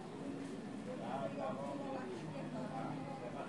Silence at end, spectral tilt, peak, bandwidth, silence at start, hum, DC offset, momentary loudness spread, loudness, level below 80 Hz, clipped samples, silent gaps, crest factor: 0 s; -6.5 dB/octave; -30 dBFS; 11.5 kHz; 0 s; none; under 0.1%; 4 LU; -44 LUFS; -76 dBFS; under 0.1%; none; 14 dB